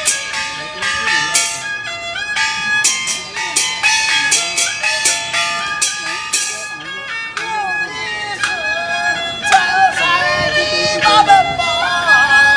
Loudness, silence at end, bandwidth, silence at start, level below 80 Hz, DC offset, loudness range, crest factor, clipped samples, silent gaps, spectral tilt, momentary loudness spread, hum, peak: -14 LUFS; 0 s; 10.5 kHz; 0 s; -48 dBFS; under 0.1%; 6 LU; 16 dB; under 0.1%; none; 0 dB/octave; 10 LU; none; 0 dBFS